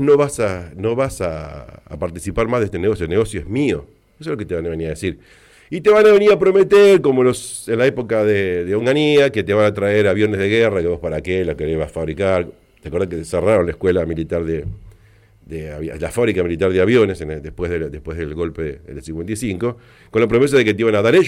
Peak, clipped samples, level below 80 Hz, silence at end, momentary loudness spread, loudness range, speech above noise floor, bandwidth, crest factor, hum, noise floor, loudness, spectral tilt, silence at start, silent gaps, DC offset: -4 dBFS; under 0.1%; -40 dBFS; 0 s; 15 LU; 8 LU; 33 dB; 13 kHz; 12 dB; none; -50 dBFS; -17 LUFS; -6 dB/octave; 0 s; none; under 0.1%